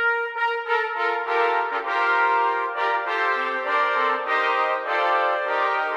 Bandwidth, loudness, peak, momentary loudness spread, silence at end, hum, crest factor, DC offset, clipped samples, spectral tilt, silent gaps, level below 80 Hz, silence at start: 10.5 kHz; -22 LUFS; -10 dBFS; 4 LU; 0 s; none; 12 dB; under 0.1%; under 0.1%; -1 dB/octave; none; -82 dBFS; 0 s